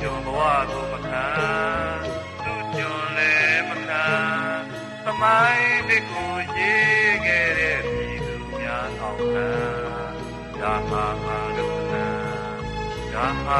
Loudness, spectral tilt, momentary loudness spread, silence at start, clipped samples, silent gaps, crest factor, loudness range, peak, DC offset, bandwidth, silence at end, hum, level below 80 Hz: -22 LUFS; -5 dB/octave; 13 LU; 0 s; under 0.1%; none; 18 dB; 7 LU; -6 dBFS; under 0.1%; 12 kHz; 0 s; none; -42 dBFS